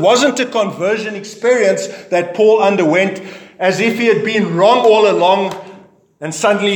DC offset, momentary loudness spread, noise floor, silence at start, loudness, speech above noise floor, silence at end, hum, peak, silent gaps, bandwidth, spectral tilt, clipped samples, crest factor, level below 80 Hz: under 0.1%; 12 LU; -42 dBFS; 0 s; -13 LUFS; 28 dB; 0 s; none; 0 dBFS; none; 18 kHz; -4.5 dB/octave; under 0.1%; 14 dB; -68 dBFS